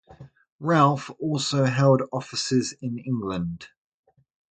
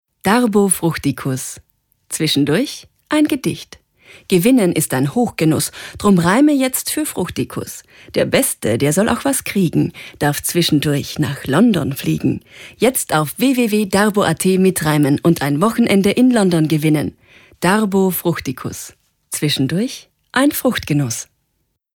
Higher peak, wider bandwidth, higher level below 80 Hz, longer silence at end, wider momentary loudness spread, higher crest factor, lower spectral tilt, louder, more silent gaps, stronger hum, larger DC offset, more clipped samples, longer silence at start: about the same, -4 dBFS vs -2 dBFS; second, 9.4 kHz vs 18.5 kHz; second, -58 dBFS vs -48 dBFS; first, 0.85 s vs 0.7 s; about the same, 13 LU vs 11 LU; first, 20 dB vs 14 dB; about the same, -5.5 dB/octave vs -5 dB/octave; second, -24 LUFS vs -16 LUFS; first, 0.52-0.59 s vs none; neither; neither; neither; second, 0.1 s vs 0.25 s